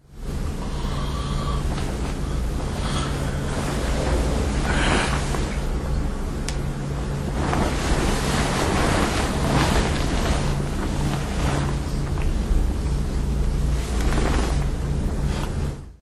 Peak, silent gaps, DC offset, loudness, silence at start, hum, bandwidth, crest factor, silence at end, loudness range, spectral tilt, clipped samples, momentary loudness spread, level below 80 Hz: -4 dBFS; none; under 0.1%; -24 LUFS; 0.1 s; none; 13 kHz; 18 dB; 0.1 s; 4 LU; -5.5 dB/octave; under 0.1%; 7 LU; -26 dBFS